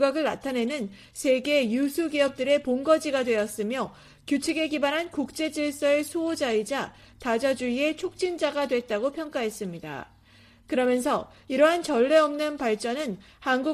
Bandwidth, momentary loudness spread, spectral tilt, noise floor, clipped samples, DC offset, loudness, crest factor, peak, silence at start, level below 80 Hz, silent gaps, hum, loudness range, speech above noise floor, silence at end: 15 kHz; 10 LU; -4 dB/octave; -55 dBFS; under 0.1%; under 0.1%; -26 LUFS; 18 dB; -8 dBFS; 0 s; -62 dBFS; none; none; 4 LU; 30 dB; 0 s